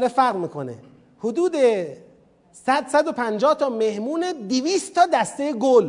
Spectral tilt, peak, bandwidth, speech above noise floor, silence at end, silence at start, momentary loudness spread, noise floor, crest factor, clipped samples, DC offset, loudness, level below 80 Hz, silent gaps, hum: -4.5 dB/octave; -4 dBFS; 11 kHz; 33 dB; 0 s; 0 s; 11 LU; -54 dBFS; 18 dB; under 0.1%; under 0.1%; -21 LUFS; -70 dBFS; none; none